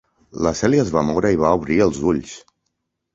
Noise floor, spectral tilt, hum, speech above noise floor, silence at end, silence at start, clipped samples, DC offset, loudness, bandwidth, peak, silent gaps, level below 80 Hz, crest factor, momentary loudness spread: -75 dBFS; -6 dB/octave; none; 57 dB; 0.75 s; 0.35 s; under 0.1%; under 0.1%; -19 LUFS; 8 kHz; -2 dBFS; none; -42 dBFS; 18 dB; 8 LU